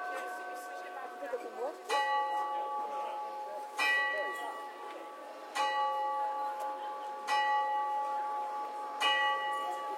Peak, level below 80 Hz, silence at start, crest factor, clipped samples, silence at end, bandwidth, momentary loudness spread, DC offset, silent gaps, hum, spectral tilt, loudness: -16 dBFS; under -90 dBFS; 0 s; 18 dB; under 0.1%; 0 s; 16.5 kHz; 13 LU; under 0.1%; none; none; 1 dB/octave; -34 LUFS